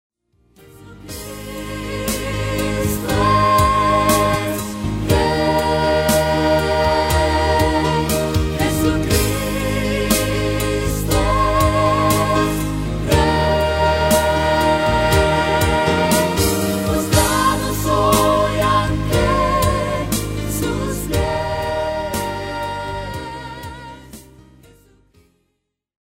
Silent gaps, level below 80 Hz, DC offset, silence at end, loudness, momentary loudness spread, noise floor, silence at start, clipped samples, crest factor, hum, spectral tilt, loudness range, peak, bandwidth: none; -28 dBFS; under 0.1%; 1.95 s; -17 LUFS; 10 LU; -73 dBFS; 0.8 s; under 0.1%; 16 dB; none; -5 dB/octave; 8 LU; -2 dBFS; 16.5 kHz